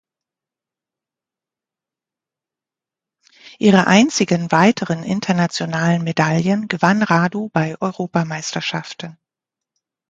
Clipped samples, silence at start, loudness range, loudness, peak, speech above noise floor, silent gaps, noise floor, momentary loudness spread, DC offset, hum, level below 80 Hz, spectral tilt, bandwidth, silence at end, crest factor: under 0.1%; 3.45 s; 4 LU; -17 LUFS; 0 dBFS; 71 dB; none; -88 dBFS; 10 LU; under 0.1%; none; -60 dBFS; -5.5 dB/octave; 9 kHz; 0.95 s; 20 dB